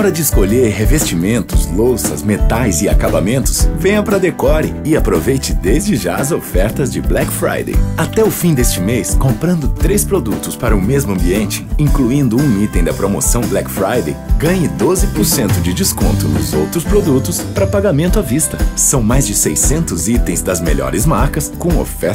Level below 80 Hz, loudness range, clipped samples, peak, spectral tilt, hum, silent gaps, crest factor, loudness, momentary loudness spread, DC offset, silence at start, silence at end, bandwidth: -20 dBFS; 2 LU; under 0.1%; -2 dBFS; -5 dB/octave; none; none; 12 dB; -14 LUFS; 4 LU; under 0.1%; 0 s; 0 s; 16.5 kHz